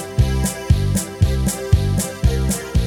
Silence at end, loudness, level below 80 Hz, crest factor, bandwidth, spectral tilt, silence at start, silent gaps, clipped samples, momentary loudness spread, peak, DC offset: 0 s; -19 LUFS; -22 dBFS; 16 dB; 19.5 kHz; -5.5 dB/octave; 0 s; none; under 0.1%; 3 LU; -2 dBFS; under 0.1%